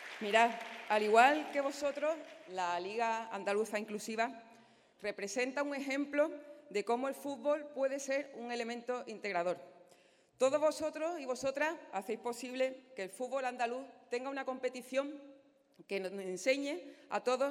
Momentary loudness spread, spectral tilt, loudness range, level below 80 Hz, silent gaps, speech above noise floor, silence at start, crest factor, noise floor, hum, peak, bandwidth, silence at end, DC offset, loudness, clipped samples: 11 LU; -3 dB/octave; 6 LU; -84 dBFS; none; 31 dB; 0 s; 22 dB; -66 dBFS; none; -14 dBFS; 16 kHz; 0 s; under 0.1%; -36 LUFS; under 0.1%